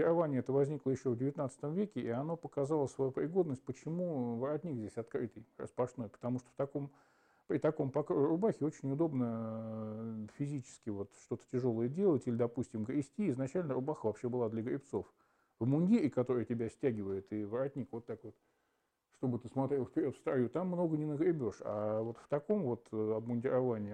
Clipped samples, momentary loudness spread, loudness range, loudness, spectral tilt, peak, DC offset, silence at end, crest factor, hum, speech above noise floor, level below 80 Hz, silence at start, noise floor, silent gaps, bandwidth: under 0.1%; 10 LU; 4 LU; -37 LUFS; -9 dB/octave; -20 dBFS; under 0.1%; 0 s; 16 dB; none; 45 dB; -76 dBFS; 0 s; -81 dBFS; none; 9.8 kHz